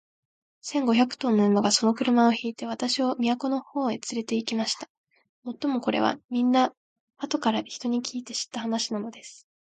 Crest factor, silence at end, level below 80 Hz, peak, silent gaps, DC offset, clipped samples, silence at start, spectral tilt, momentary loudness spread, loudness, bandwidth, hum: 18 dB; 0.35 s; -74 dBFS; -8 dBFS; 4.90-5.04 s, 5.29-5.42 s, 6.24-6.29 s, 6.77-7.08 s; under 0.1%; under 0.1%; 0.65 s; -4 dB/octave; 12 LU; -26 LUFS; 9.2 kHz; none